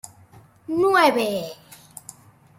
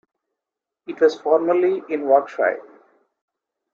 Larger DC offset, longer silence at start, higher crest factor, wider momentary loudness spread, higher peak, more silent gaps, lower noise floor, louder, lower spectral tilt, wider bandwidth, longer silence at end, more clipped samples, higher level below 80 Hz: neither; second, 0.05 s vs 0.9 s; about the same, 18 dB vs 20 dB; first, 26 LU vs 8 LU; second, -6 dBFS vs -2 dBFS; neither; second, -51 dBFS vs -86 dBFS; about the same, -20 LUFS vs -19 LUFS; second, -4 dB/octave vs -5.5 dB/octave; first, 16.5 kHz vs 7.2 kHz; about the same, 1.05 s vs 1.15 s; neither; first, -66 dBFS vs -76 dBFS